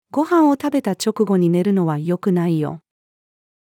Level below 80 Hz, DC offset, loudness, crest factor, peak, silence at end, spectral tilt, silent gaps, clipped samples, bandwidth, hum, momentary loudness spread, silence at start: -70 dBFS; under 0.1%; -18 LUFS; 14 dB; -6 dBFS; 0.85 s; -7 dB/octave; none; under 0.1%; 18 kHz; none; 7 LU; 0.15 s